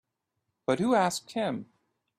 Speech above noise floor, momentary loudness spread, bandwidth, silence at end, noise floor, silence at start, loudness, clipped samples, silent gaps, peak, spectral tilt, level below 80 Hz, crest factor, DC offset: 54 dB; 11 LU; 15.5 kHz; 0.55 s; -82 dBFS; 0.7 s; -29 LUFS; under 0.1%; none; -12 dBFS; -5 dB/octave; -70 dBFS; 18 dB; under 0.1%